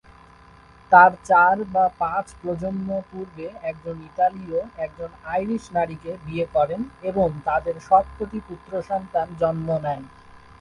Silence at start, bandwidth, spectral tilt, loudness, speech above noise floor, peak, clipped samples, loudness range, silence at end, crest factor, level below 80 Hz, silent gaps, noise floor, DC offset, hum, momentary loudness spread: 0.9 s; 11 kHz; -7 dB/octave; -22 LUFS; 27 dB; 0 dBFS; under 0.1%; 8 LU; 0.25 s; 22 dB; -50 dBFS; none; -49 dBFS; under 0.1%; none; 16 LU